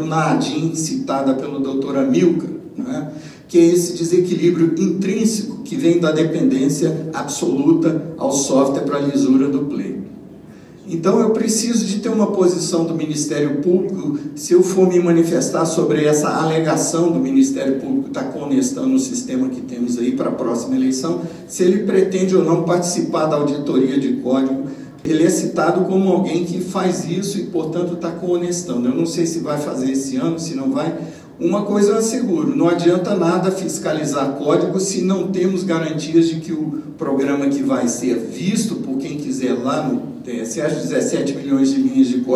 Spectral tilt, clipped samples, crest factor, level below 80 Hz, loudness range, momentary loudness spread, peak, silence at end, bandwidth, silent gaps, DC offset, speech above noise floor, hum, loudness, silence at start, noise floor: -5.5 dB/octave; under 0.1%; 16 dB; -60 dBFS; 4 LU; 8 LU; -2 dBFS; 0 s; 13.5 kHz; none; under 0.1%; 22 dB; none; -18 LUFS; 0 s; -39 dBFS